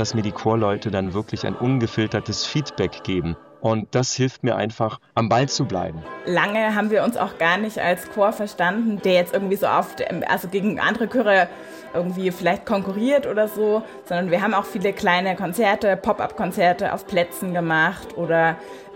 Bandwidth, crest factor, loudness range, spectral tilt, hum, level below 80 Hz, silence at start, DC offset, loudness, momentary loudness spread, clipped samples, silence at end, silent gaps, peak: 17 kHz; 18 dB; 3 LU; -5 dB/octave; none; -54 dBFS; 0 s; under 0.1%; -22 LUFS; 7 LU; under 0.1%; 0 s; none; -4 dBFS